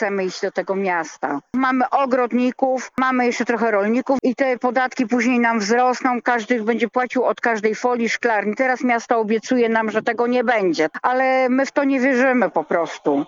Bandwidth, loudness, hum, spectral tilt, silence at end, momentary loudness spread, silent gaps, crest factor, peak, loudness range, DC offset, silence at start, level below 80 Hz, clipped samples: 7.6 kHz; -19 LUFS; none; -4.5 dB/octave; 0 s; 4 LU; none; 14 dB; -4 dBFS; 1 LU; under 0.1%; 0 s; -68 dBFS; under 0.1%